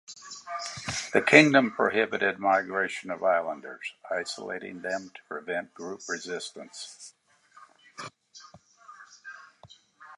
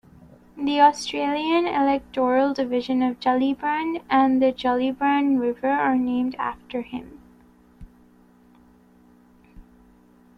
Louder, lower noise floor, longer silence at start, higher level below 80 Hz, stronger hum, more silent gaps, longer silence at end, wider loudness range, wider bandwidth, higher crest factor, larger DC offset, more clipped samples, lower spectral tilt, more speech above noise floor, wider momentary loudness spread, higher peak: second, -26 LUFS vs -22 LUFS; about the same, -57 dBFS vs -54 dBFS; second, 0.1 s vs 0.55 s; second, -70 dBFS vs -56 dBFS; neither; neither; second, 0 s vs 0.75 s; first, 20 LU vs 11 LU; first, 11.5 kHz vs 10 kHz; first, 28 dB vs 18 dB; neither; neither; about the same, -4 dB/octave vs -4.5 dB/octave; about the same, 30 dB vs 33 dB; first, 22 LU vs 11 LU; first, 0 dBFS vs -4 dBFS